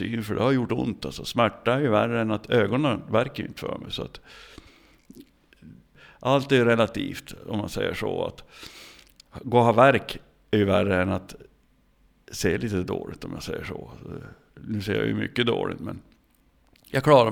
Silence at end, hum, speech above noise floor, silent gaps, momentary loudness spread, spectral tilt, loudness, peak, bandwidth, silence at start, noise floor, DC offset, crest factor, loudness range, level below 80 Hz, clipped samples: 0 s; none; 38 dB; none; 20 LU; -6 dB/octave; -25 LUFS; -4 dBFS; 18.5 kHz; 0 s; -62 dBFS; under 0.1%; 22 dB; 8 LU; -52 dBFS; under 0.1%